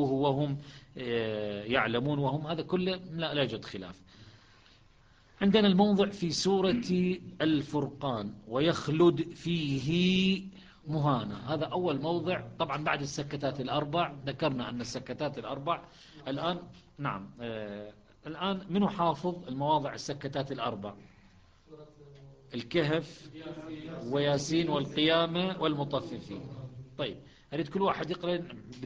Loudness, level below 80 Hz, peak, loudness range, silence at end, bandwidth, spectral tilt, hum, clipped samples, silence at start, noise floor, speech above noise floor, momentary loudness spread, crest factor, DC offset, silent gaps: -31 LUFS; -60 dBFS; -10 dBFS; 8 LU; 0 s; 9.4 kHz; -6 dB/octave; none; under 0.1%; 0 s; -61 dBFS; 30 dB; 16 LU; 20 dB; under 0.1%; none